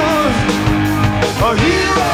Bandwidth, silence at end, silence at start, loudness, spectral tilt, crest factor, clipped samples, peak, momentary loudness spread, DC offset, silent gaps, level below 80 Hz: 16.5 kHz; 0 s; 0 s; -14 LUFS; -5 dB/octave; 12 dB; under 0.1%; -2 dBFS; 2 LU; under 0.1%; none; -28 dBFS